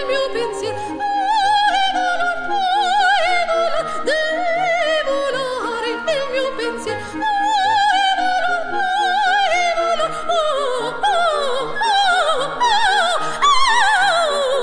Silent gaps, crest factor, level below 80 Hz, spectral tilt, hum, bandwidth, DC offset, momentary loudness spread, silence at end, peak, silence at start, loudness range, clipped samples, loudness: none; 14 dB; -48 dBFS; -1.5 dB/octave; none; 10 kHz; under 0.1%; 7 LU; 0 s; -4 dBFS; 0 s; 4 LU; under 0.1%; -17 LUFS